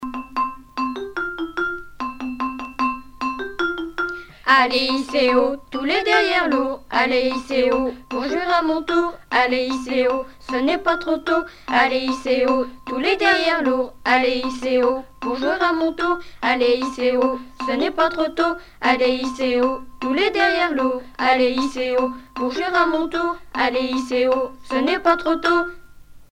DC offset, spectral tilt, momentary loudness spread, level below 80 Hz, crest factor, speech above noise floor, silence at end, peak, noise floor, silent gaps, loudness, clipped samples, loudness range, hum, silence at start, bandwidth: under 0.1%; -3.5 dB/octave; 9 LU; -48 dBFS; 18 dB; 22 dB; 0.1 s; -2 dBFS; -42 dBFS; none; -20 LUFS; under 0.1%; 2 LU; none; 0 s; 12.5 kHz